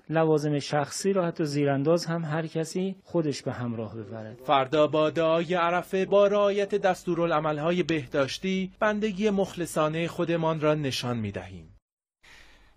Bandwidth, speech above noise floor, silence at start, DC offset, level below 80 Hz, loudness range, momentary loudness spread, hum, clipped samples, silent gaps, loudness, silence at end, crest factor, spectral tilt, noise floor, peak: 15.5 kHz; 28 dB; 0.1 s; under 0.1%; -60 dBFS; 4 LU; 9 LU; none; under 0.1%; 11.82-11.97 s; -26 LUFS; 0.4 s; 18 dB; -6 dB/octave; -54 dBFS; -8 dBFS